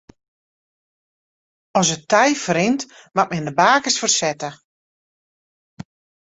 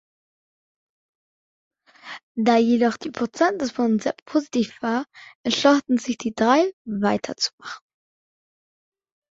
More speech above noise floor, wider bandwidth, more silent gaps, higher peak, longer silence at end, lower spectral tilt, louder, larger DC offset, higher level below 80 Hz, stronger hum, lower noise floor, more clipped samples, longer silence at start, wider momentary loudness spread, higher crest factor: first, over 72 dB vs 20 dB; about the same, 8.4 kHz vs 7.8 kHz; first, 4.64-5.77 s vs 2.23-2.35 s, 4.22-4.26 s, 5.35-5.44 s, 6.73-6.85 s, 7.53-7.58 s; about the same, -2 dBFS vs -4 dBFS; second, 0.4 s vs 1.6 s; second, -3 dB/octave vs -4.5 dB/octave; first, -18 LUFS vs -22 LUFS; neither; about the same, -62 dBFS vs -66 dBFS; neither; first, under -90 dBFS vs -42 dBFS; neither; second, 1.75 s vs 2.05 s; second, 10 LU vs 16 LU; about the same, 20 dB vs 20 dB